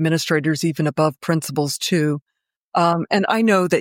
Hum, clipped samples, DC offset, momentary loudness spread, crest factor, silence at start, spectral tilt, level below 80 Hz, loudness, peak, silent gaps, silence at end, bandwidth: none; under 0.1%; under 0.1%; 6 LU; 14 dB; 0 s; -5 dB/octave; -64 dBFS; -20 LUFS; -4 dBFS; 2.22-2.26 s, 2.56-2.72 s; 0 s; 17 kHz